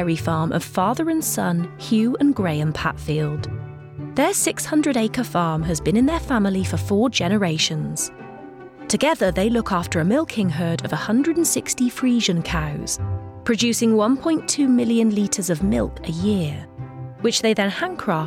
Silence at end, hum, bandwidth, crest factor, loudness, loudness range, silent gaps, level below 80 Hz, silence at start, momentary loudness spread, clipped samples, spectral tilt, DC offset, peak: 0 s; none; 17 kHz; 14 dB; -21 LUFS; 2 LU; none; -42 dBFS; 0 s; 9 LU; under 0.1%; -4.5 dB/octave; under 0.1%; -6 dBFS